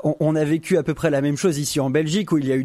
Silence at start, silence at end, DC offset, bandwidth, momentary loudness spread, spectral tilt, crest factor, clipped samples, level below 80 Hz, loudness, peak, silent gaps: 0.05 s; 0 s; under 0.1%; 14.5 kHz; 1 LU; -6 dB/octave; 14 dB; under 0.1%; -52 dBFS; -21 LUFS; -6 dBFS; none